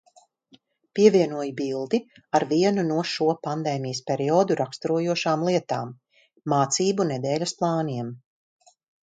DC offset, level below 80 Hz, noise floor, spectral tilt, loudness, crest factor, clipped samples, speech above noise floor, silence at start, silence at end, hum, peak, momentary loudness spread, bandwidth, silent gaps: under 0.1%; -70 dBFS; -59 dBFS; -5 dB/octave; -24 LUFS; 20 dB; under 0.1%; 36 dB; 0.95 s; 0.85 s; none; -4 dBFS; 9 LU; 9.4 kHz; none